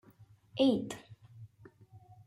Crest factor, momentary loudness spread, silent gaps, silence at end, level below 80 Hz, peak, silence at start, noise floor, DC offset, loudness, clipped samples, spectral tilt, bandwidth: 20 dB; 26 LU; none; 0.3 s; -70 dBFS; -16 dBFS; 0.55 s; -61 dBFS; under 0.1%; -32 LUFS; under 0.1%; -6 dB/octave; 13 kHz